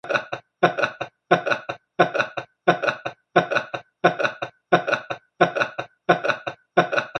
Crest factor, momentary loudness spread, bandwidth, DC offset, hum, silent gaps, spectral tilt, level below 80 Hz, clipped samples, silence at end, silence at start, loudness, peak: 22 dB; 10 LU; 9 kHz; under 0.1%; none; none; -5.5 dB/octave; -68 dBFS; under 0.1%; 0 s; 0.05 s; -23 LUFS; 0 dBFS